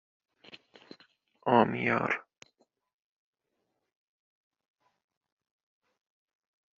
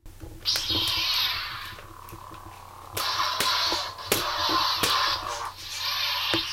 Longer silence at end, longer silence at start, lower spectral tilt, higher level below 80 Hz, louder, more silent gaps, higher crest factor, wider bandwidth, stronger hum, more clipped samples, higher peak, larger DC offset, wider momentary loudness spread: first, 4.6 s vs 0 s; first, 1.45 s vs 0.05 s; first, -4.5 dB/octave vs -1.5 dB/octave; second, -76 dBFS vs -50 dBFS; second, -28 LUFS vs -25 LUFS; neither; first, 28 dB vs 22 dB; second, 7.4 kHz vs 17 kHz; neither; neither; about the same, -8 dBFS vs -6 dBFS; neither; second, 10 LU vs 20 LU